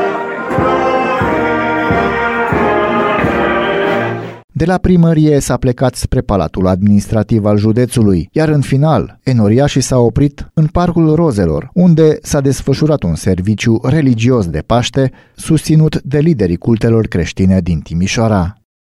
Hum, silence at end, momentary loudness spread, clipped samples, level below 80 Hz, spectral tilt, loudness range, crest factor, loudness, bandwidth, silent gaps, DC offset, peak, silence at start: none; 0.45 s; 5 LU; under 0.1%; -30 dBFS; -6.5 dB/octave; 1 LU; 12 dB; -12 LUFS; 13.5 kHz; 4.44-4.48 s; under 0.1%; 0 dBFS; 0 s